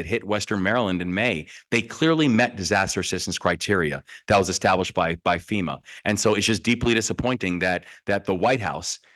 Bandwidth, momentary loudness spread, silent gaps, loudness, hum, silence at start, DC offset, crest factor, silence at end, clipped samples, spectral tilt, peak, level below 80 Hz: 12.5 kHz; 7 LU; none; -23 LUFS; none; 0 s; under 0.1%; 18 dB; 0.2 s; under 0.1%; -4 dB/octave; -6 dBFS; -50 dBFS